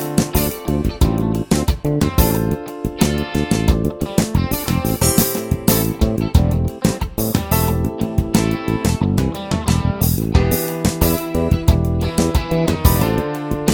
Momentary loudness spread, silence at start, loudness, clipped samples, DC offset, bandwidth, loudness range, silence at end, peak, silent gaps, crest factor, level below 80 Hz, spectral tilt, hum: 4 LU; 0 s; -18 LUFS; under 0.1%; under 0.1%; 19.5 kHz; 1 LU; 0 s; 0 dBFS; none; 18 dB; -24 dBFS; -5.5 dB/octave; none